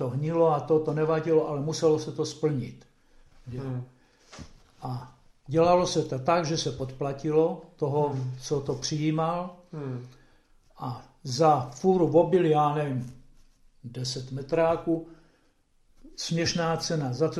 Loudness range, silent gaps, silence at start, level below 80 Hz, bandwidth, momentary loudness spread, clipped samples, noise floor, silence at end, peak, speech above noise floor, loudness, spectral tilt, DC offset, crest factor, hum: 7 LU; none; 0 s; -56 dBFS; 12 kHz; 17 LU; under 0.1%; -65 dBFS; 0 s; -8 dBFS; 38 dB; -27 LUFS; -6 dB/octave; under 0.1%; 20 dB; none